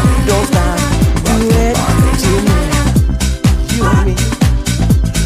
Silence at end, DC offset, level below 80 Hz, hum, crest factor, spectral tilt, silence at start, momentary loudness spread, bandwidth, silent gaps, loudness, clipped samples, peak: 0 s; under 0.1%; -16 dBFS; none; 10 dB; -5.5 dB/octave; 0 s; 2 LU; 16 kHz; none; -13 LUFS; under 0.1%; 0 dBFS